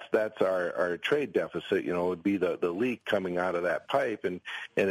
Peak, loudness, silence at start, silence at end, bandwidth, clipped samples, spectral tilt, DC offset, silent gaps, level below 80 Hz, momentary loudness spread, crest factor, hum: -12 dBFS; -30 LUFS; 0 s; 0 s; 15.5 kHz; under 0.1%; -6 dB/octave; under 0.1%; none; -70 dBFS; 4 LU; 16 dB; none